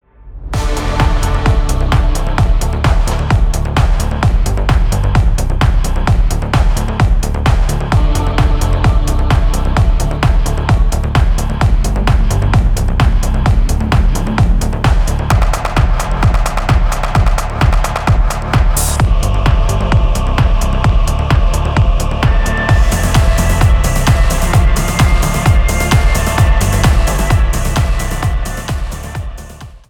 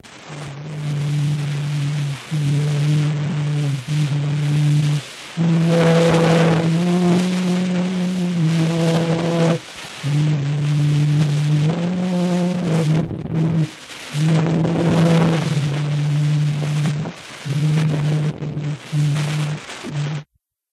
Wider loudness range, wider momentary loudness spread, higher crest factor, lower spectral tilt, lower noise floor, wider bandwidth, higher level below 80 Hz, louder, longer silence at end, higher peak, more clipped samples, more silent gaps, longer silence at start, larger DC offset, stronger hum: about the same, 2 LU vs 4 LU; second, 3 LU vs 10 LU; second, 10 dB vs 16 dB; second, -5.5 dB/octave vs -7 dB/octave; second, -31 dBFS vs -55 dBFS; first, 17.5 kHz vs 12 kHz; first, -12 dBFS vs -52 dBFS; first, -14 LUFS vs -19 LUFS; second, 0.1 s vs 0.5 s; about the same, 0 dBFS vs -2 dBFS; neither; neither; first, 0.2 s vs 0.05 s; neither; neither